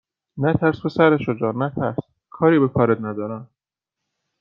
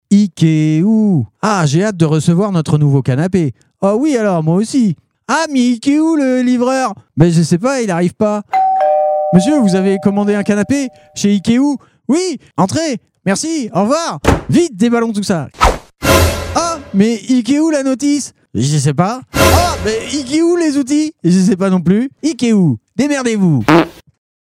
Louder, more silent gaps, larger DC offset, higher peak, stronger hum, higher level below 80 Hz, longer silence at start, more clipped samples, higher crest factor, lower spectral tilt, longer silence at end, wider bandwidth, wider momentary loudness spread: second, -20 LUFS vs -13 LUFS; neither; neither; about the same, -2 dBFS vs 0 dBFS; neither; second, -56 dBFS vs -32 dBFS; first, 0.35 s vs 0.1 s; second, under 0.1% vs 0.1%; first, 18 dB vs 12 dB; first, -10 dB/octave vs -6 dB/octave; first, 0.95 s vs 0.5 s; second, 5.8 kHz vs 16 kHz; first, 13 LU vs 6 LU